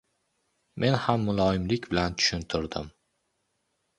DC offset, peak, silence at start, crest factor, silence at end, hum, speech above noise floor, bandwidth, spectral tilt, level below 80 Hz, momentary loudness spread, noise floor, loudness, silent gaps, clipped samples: under 0.1%; -6 dBFS; 0.75 s; 22 dB; 1.1 s; none; 50 dB; 11 kHz; -5 dB/octave; -48 dBFS; 12 LU; -76 dBFS; -27 LUFS; none; under 0.1%